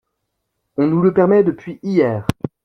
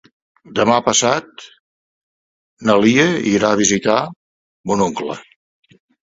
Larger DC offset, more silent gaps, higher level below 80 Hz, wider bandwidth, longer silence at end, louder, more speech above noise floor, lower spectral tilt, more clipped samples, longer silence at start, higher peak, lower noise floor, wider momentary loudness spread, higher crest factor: neither; second, none vs 1.60-2.57 s, 4.16-4.64 s; first, -48 dBFS vs -54 dBFS; first, 12.5 kHz vs 8 kHz; second, 0.2 s vs 0.8 s; about the same, -16 LUFS vs -16 LUFS; second, 59 dB vs over 74 dB; first, -8.5 dB/octave vs -3.5 dB/octave; neither; first, 0.8 s vs 0.5 s; about the same, -2 dBFS vs 0 dBFS; second, -74 dBFS vs under -90 dBFS; about the same, 12 LU vs 14 LU; about the same, 16 dB vs 18 dB